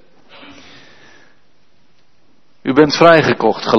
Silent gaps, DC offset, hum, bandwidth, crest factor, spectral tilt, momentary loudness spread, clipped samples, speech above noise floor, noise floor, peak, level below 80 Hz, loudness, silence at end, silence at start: none; 0.7%; none; 7.2 kHz; 16 dB; -5.5 dB/octave; 8 LU; 0.2%; 48 dB; -58 dBFS; 0 dBFS; -54 dBFS; -11 LUFS; 0 s; 2.65 s